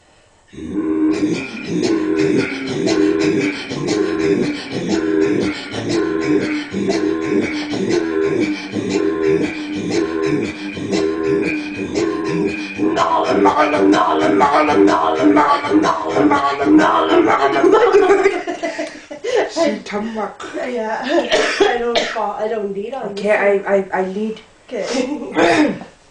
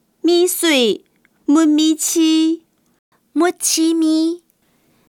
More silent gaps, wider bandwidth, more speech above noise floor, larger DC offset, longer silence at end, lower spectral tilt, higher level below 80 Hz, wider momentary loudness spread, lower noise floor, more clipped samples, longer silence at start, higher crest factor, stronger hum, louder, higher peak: second, none vs 2.99-3.12 s; second, 9.8 kHz vs 17.5 kHz; second, 33 dB vs 45 dB; neither; second, 0.2 s vs 0.7 s; first, -5 dB/octave vs -1.5 dB/octave; first, -50 dBFS vs -76 dBFS; about the same, 10 LU vs 12 LU; second, -51 dBFS vs -60 dBFS; neither; first, 0.55 s vs 0.25 s; about the same, 16 dB vs 14 dB; neither; about the same, -17 LUFS vs -15 LUFS; about the same, 0 dBFS vs -2 dBFS